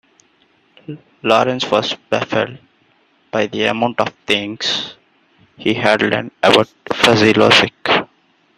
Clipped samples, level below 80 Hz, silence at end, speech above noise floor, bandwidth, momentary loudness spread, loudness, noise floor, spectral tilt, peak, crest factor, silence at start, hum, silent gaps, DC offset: under 0.1%; -54 dBFS; 0.55 s; 41 dB; 14.5 kHz; 13 LU; -15 LUFS; -57 dBFS; -4 dB/octave; 0 dBFS; 18 dB; 0.9 s; none; none; under 0.1%